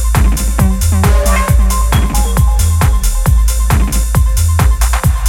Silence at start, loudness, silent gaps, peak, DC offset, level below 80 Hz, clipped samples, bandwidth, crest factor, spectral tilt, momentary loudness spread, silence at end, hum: 0 s; -12 LUFS; none; 0 dBFS; under 0.1%; -12 dBFS; under 0.1%; 17 kHz; 10 dB; -5 dB/octave; 2 LU; 0 s; none